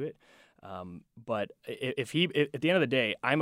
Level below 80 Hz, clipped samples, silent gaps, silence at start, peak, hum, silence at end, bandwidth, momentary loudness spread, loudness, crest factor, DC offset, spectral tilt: -74 dBFS; under 0.1%; none; 0 s; -10 dBFS; none; 0 s; 16 kHz; 18 LU; -30 LUFS; 20 dB; under 0.1%; -5.5 dB/octave